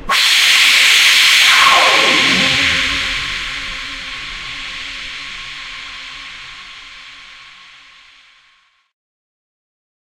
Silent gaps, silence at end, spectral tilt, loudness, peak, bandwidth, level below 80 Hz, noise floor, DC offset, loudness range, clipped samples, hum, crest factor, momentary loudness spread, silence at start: none; 2.5 s; 0 dB/octave; -9 LUFS; 0 dBFS; 17 kHz; -42 dBFS; -55 dBFS; under 0.1%; 23 LU; under 0.1%; none; 16 dB; 22 LU; 0 s